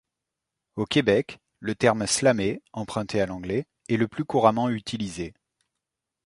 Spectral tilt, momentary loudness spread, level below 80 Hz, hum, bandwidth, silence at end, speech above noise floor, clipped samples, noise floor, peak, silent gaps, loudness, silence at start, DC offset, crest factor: -4.5 dB/octave; 13 LU; -56 dBFS; none; 11.5 kHz; 0.95 s; 61 dB; under 0.1%; -85 dBFS; -4 dBFS; none; -25 LUFS; 0.75 s; under 0.1%; 22 dB